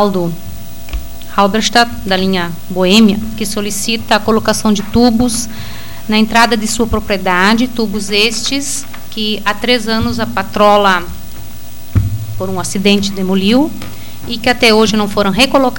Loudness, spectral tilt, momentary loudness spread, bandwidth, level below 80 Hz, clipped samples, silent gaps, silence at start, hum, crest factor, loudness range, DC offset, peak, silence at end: -12 LUFS; -4 dB/octave; 18 LU; 17.5 kHz; -32 dBFS; under 0.1%; none; 0 s; 60 Hz at -35 dBFS; 14 dB; 2 LU; 7%; 0 dBFS; 0 s